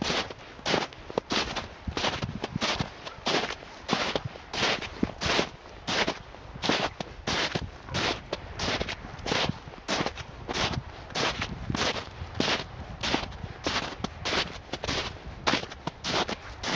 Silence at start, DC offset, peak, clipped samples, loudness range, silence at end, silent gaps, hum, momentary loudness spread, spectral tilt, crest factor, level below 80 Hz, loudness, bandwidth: 0 s; under 0.1%; -8 dBFS; under 0.1%; 2 LU; 0 s; none; none; 8 LU; -3.5 dB/octave; 24 dB; -48 dBFS; -30 LUFS; 10.5 kHz